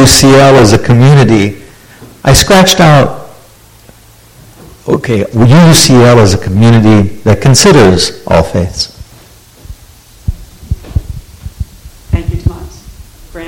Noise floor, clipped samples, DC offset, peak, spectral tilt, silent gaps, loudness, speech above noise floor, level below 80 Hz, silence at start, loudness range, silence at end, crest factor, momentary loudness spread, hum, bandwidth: -38 dBFS; 2%; under 0.1%; 0 dBFS; -5 dB/octave; none; -6 LUFS; 33 dB; -26 dBFS; 0 s; 15 LU; 0 s; 8 dB; 19 LU; none; over 20 kHz